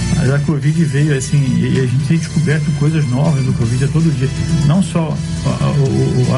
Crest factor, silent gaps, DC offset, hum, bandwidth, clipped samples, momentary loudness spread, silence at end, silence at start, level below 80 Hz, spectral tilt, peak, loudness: 10 dB; none; under 0.1%; none; 11.5 kHz; under 0.1%; 3 LU; 0 s; 0 s; -32 dBFS; -6.5 dB/octave; -4 dBFS; -15 LUFS